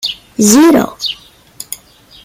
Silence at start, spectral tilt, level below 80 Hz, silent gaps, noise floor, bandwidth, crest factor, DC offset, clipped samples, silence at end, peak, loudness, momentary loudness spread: 0.05 s; -3.5 dB/octave; -48 dBFS; none; -41 dBFS; 17 kHz; 12 dB; under 0.1%; under 0.1%; 0.5 s; 0 dBFS; -10 LUFS; 21 LU